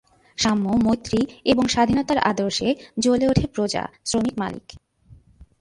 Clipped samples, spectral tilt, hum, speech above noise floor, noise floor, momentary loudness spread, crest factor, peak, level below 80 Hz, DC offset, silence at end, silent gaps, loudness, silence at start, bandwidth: under 0.1%; -4.5 dB/octave; none; 30 dB; -51 dBFS; 7 LU; 18 dB; -4 dBFS; -44 dBFS; under 0.1%; 0.85 s; none; -22 LUFS; 0.4 s; 11.5 kHz